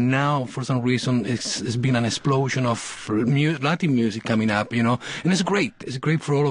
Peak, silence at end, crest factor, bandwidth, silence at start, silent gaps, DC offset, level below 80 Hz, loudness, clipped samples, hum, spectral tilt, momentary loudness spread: -6 dBFS; 0 s; 16 dB; 10.5 kHz; 0 s; none; under 0.1%; -56 dBFS; -23 LUFS; under 0.1%; none; -5.5 dB/octave; 4 LU